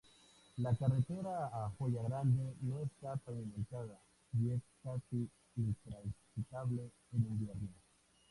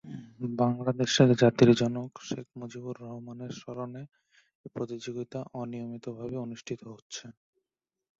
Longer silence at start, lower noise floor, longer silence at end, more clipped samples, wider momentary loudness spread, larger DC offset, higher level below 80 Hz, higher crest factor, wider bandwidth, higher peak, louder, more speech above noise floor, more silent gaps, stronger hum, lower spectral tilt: first, 0.55 s vs 0.05 s; second, -66 dBFS vs -89 dBFS; second, 0.55 s vs 0.9 s; neither; second, 11 LU vs 20 LU; neither; about the same, -62 dBFS vs -66 dBFS; second, 18 dB vs 24 dB; first, 11.5 kHz vs 7.8 kHz; second, -22 dBFS vs -8 dBFS; second, -41 LUFS vs -29 LUFS; second, 27 dB vs 60 dB; second, none vs 4.55-4.64 s, 7.02-7.10 s; neither; first, -9 dB/octave vs -6 dB/octave